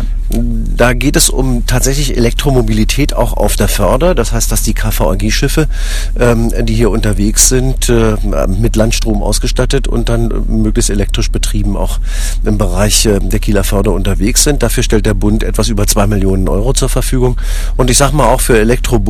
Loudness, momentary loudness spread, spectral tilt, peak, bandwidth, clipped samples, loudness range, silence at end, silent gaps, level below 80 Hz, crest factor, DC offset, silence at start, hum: -12 LUFS; 6 LU; -4.5 dB/octave; 0 dBFS; 14.5 kHz; 0.8%; 2 LU; 0 s; none; -14 dBFS; 10 dB; under 0.1%; 0 s; none